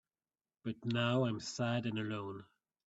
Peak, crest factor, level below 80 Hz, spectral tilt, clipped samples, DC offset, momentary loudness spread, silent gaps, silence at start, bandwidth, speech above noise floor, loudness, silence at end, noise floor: -20 dBFS; 18 dB; -76 dBFS; -5.5 dB/octave; under 0.1%; under 0.1%; 14 LU; none; 0.65 s; 8 kHz; over 53 dB; -37 LUFS; 0.45 s; under -90 dBFS